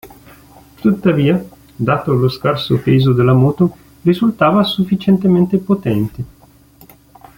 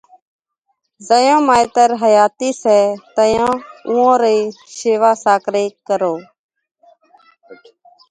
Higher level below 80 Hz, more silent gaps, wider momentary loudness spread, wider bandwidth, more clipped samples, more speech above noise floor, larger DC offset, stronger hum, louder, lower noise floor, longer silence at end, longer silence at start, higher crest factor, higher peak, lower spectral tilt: first, -46 dBFS vs -56 dBFS; second, none vs 6.39-6.49 s, 6.71-6.75 s; about the same, 8 LU vs 8 LU; first, 17 kHz vs 11 kHz; neither; second, 32 dB vs 55 dB; neither; neither; about the same, -15 LUFS vs -14 LUFS; second, -45 dBFS vs -69 dBFS; first, 1.1 s vs 0.55 s; second, 0.05 s vs 1 s; about the same, 14 dB vs 16 dB; about the same, -2 dBFS vs 0 dBFS; first, -8.5 dB/octave vs -4 dB/octave